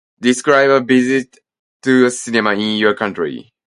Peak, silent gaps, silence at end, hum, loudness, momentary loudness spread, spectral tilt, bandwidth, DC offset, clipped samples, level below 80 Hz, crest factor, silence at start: 0 dBFS; 1.59-1.80 s; 0.35 s; none; -15 LUFS; 12 LU; -4 dB/octave; 11.5 kHz; under 0.1%; under 0.1%; -60 dBFS; 16 dB; 0.2 s